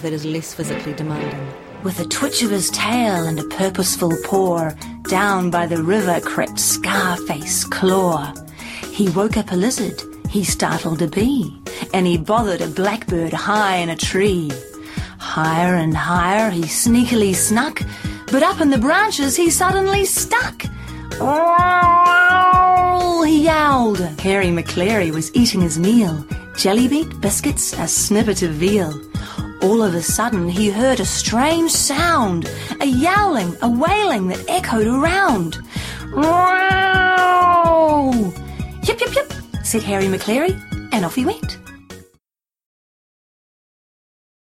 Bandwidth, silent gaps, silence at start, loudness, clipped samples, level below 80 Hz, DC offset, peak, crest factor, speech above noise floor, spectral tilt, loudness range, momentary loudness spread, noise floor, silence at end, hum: 16.5 kHz; none; 0 s; -17 LUFS; under 0.1%; -38 dBFS; under 0.1%; -2 dBFS; 14 dB; 55 dB; -4 dB/octave; 6 LU; 13 LU; -72 dBFS; 2.45 s; none